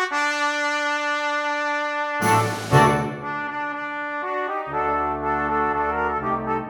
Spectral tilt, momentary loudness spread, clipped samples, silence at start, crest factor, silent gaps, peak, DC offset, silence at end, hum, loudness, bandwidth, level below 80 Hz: -5 dB/octave; 8 LU; under 0.1%; 0 s; 22 dB; none; -2 dBFS; under 0.1%; 0 s; none; -22 LUFS; 18 kHz; -48 dBFS